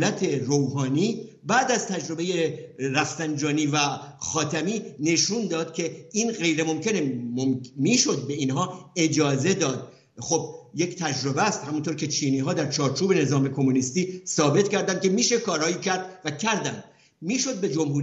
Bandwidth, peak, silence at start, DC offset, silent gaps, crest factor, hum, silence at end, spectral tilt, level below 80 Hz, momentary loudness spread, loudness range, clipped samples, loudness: 8.2 kHz; -6 dBFS; 0 s; under 0.1%; none; 18 dB; none; 0 s; -4 dB/octave; -68 dBFS; 7 LU; 3 LU; under 0.1%; -25 LUFS